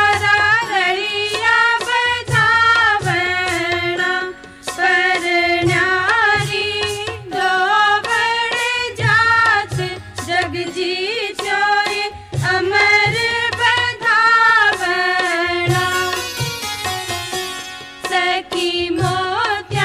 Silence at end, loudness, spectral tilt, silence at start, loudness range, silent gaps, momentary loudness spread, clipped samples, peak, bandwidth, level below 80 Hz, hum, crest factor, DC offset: 0 s; -15 LUFS; -3.5 dB/octave; 0 s; 6 LU; none; 10 LU; under 0.1%; -2 dBFS; 16 kHz; -46 dBFS; none; 16 dB; under 0.1%